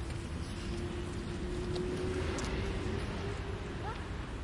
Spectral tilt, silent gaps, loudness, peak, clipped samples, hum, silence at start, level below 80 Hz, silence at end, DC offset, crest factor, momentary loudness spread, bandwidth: -6 dB/octave; none; -38 LUFS; -24 dBFS; under 0.1%; none; 0 s; -44 dBFS; 0 s; under 0.1%; 14 dB; 5 LU; 11.5 kHz